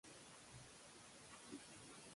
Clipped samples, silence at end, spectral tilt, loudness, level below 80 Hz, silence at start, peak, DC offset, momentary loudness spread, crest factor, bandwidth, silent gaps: under 0.1%; 0 s; -2.5 dB/octave; -59 LUFS; -80 dBFS; 0.05 s; -42 dBFS; under 0.1%; 3 LU; 18 dB; 11.5 kHz; none